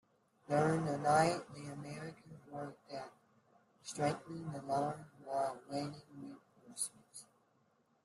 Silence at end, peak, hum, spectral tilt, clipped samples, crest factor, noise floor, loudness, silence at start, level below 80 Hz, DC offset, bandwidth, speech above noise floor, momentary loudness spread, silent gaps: 0.8 s; -18 dBFS; none; -5 dB/octave; under 0.1%; 22 dB; -75 dBFS; -38 LUFS; 0.5 s; -76 dBFS; under 0.1%; 12.5 kHz; 39 dB; 21 LU; none